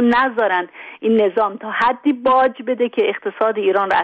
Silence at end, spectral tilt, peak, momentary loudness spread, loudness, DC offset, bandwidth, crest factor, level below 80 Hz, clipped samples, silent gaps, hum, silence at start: 0 s; -6.5 dB/octave; -4 dBFS; 6 LU; -18 LUFS; under 0.1%; 7.4 kHz; 12 dB; -58 dBFS; under 0.1%; none; none; 0 s